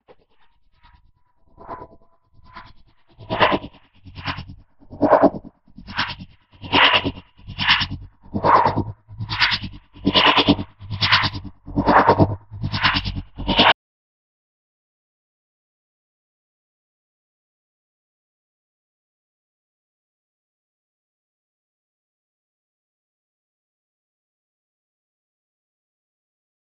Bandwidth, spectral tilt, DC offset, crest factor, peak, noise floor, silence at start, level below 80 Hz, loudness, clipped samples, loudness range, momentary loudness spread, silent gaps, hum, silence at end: 7.2 kHz; -6.5 dB/octave; under 0.1%; 24 dB; 0 dBFS; -58 dBFS; 1.6 s; -44 dBFS; -18 LUFS; under 0.1%; 9 LU; 21 LU; none; none; 12.9 s